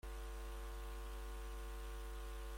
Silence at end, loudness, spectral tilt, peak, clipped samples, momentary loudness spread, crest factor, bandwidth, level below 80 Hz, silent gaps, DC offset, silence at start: 0 s; -51 LUFS; -4.5 dB/octave; -40 dBFS; under 0.1%; 0 LU; 8 dB; 16.5 kHz; -48 dBFS; none; under 0.1%; 0.05 s